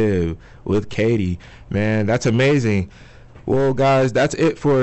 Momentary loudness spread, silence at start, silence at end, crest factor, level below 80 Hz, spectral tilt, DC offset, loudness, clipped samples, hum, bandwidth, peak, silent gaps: 10 LU; 0 s; 0 s; 10 dB; -44 dBFS; -6.5 dB/octave; under 0.1%; -19 LUFS; under 0.1%; none; 8.4 kHz; -10 dBFS; none